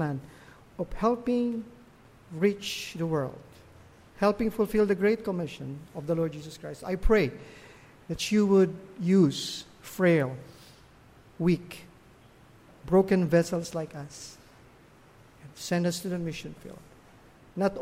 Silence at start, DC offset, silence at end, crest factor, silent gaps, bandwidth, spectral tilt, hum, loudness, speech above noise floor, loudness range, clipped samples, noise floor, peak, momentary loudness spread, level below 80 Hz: 0 s; under 0.1%; 0 s; 20 dB; none; 16 kHz; -6 dB/octave; none; -28 LUFS; 28 dB; 6 LU; under 0.1%; -56 dBFS; -10 dBFS; 21 LU; -46 dBFS